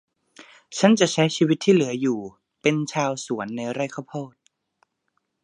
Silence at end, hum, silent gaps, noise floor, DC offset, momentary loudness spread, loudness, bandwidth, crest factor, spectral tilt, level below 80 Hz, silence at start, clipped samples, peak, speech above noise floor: 1.15 s; none; none; -75 dBFS; under 0.1%; 16 LU; -22 LUFS; 11 kHz; 22 dB; -5 dB/octave; -72 dBFS; 0.4 s; under 0.1%; -2 dBFS; 53 dB